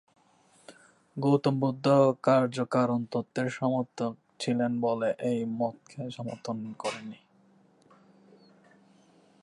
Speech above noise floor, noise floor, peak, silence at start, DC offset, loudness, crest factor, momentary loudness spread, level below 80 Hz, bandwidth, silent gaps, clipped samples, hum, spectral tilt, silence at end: 35 dB; -63 dBFS; -12 dBFS; 0.7 s; under 0.1%; -29 LUFS; 18 dB; 14 LU; -76 dBFS; 11.5 kHz; none; under 0.1%; none; -7 dB/octave; 2.25 s